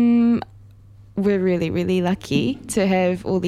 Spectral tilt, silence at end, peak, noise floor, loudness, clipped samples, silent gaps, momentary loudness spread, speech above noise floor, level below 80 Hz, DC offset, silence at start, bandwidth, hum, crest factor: -6.5 dB/octave; 0 s; -6 dBFS; -46 dBFS; -20 LUFS; under 0.1%; none; 6 LU; 26 dB; -50 dBFS; under 0.1%; 0 s; 13.5 kHz; none; 14 dB